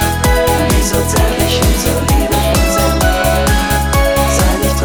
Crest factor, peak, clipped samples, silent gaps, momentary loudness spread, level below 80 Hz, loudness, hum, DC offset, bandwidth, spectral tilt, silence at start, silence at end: 12 dB; 0 dBFS; under 0.1%; none; 1 LU; -16 dBFS; -12 LUFS; none; 0.8%; 19.5 kHz; -4.5 dB/octave; 0 s; 0 s